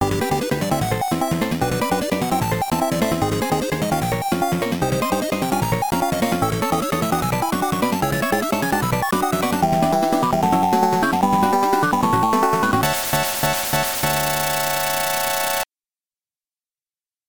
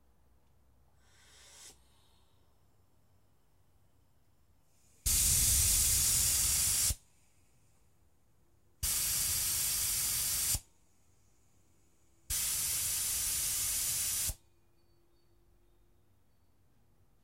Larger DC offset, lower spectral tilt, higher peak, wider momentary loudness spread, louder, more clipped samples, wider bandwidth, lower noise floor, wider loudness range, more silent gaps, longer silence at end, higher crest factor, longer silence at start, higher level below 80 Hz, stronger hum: first, 0.5% vs under 0.1%; first, -4.5 dB/octave vs 0 dB/octave; first, -4 dBFS vs -16 dBFS; second, 4 LU vs 8 LU; first, -20 LUFS vs -29 LUFS; neither; first, over 20 kHz vs 16 kHz; first, under -90 dBFS vs -72 dBFS; second, 3 LU vs 7 LU; neither; second, 1.65 s vs 2.9 s; second, 16 dB vs 22 dB; second, 0 s vs 1.55 s; first, -44 dBFS vs -50 dBFS; neither